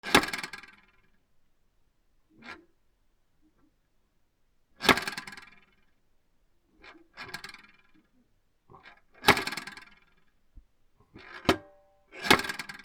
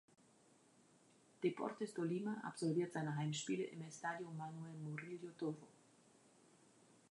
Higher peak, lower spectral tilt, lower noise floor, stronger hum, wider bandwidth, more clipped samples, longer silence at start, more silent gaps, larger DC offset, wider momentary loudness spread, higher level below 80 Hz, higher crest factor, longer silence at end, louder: first, 0 dBFS vs -26 dBFS; second, -3 dB/octave vs -5.5 dB/octave; about the same, -70 dBFS vs -71 dBFS; neither; first, 19.5 kHz vs 11 kHz; neither; second, 0.05 s vs 1.4 s; neither; neither; first, 25 LU vs 9 LU; first, -58 dBFS vs under -90 dBFS; first, 34 dB vs 20 dB; second, 0.05 s vs 1.4 s; first, -27 LUFS vs -45 LUFS